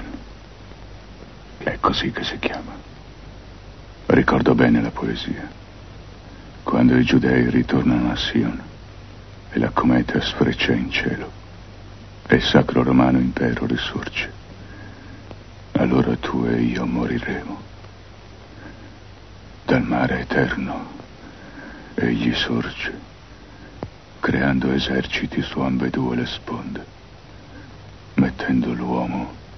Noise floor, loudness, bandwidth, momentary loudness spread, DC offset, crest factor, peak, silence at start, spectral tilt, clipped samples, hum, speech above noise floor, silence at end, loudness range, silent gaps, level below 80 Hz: -42 dBFS; -21 LUFS; 6.4 kHz; 25 LU; 0.3%; 22 dB; 0 dBFS; 0 s; -7 dB/octave; under 0.1%; none; 22 dB; 0 s; 7 LU; none; -40 dBFS